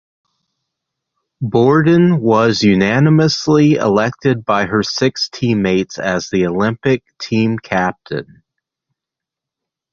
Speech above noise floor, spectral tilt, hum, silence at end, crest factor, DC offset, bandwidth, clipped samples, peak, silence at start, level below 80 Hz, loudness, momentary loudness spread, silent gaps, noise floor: 70 dB; -6 dB/octave; none; 1.7 s; 14 dB; under 0.1%; 7.4 kHz; under 0.1%; 0 dBFS; 1.4 s; -48 dBFS; -14 LUFS; 8 LU; none; -84 dBFS